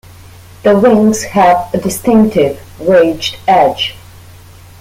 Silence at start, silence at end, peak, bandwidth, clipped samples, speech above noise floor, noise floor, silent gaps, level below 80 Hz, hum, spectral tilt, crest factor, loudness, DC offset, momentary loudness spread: 0.65 s; 0.9 s; 0 dBFS; 16.5 kHz; under 0.1%; 26 dB; -36 dBFS; none; -42 dBFS; none; -5 dB/octave; 12 dB; -11 LUFS; under 0.1%; 8 LU